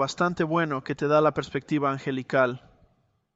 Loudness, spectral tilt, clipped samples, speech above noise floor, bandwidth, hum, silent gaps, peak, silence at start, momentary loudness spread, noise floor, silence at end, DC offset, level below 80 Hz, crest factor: -25 LUFS; -6 dB/octave; under 0.1%; 43 dB; 8 kHz; none; none; -8 dBFS; 0 s; 8 LU; -68 dBFS; 0.75 s; under 0.1%; -62 dBFS; 18 dB